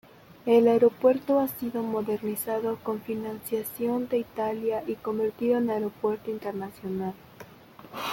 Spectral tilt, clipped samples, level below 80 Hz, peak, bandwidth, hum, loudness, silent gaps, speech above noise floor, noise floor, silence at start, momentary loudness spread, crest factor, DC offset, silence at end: -6 dB/octave; under 0.1%; -66 dBFS; -8 dBFS; 17 kHz; none; -27 LUFS; none; 23 dB; -49 dBFS; 0.45 s; 13 LU; 18 dB; under 0.1%; 0 s